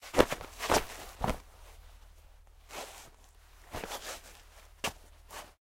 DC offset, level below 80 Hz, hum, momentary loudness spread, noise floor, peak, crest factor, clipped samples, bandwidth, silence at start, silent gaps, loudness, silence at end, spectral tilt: under 0.1%; -50 dBFS; none; 25 LU; -57 dBFS; -4 dBFS; 34 dB; under 0.1%; 16.5 kHz; 0 s; none; -35 LUFS; 0.1 s; -3.5 dB/octave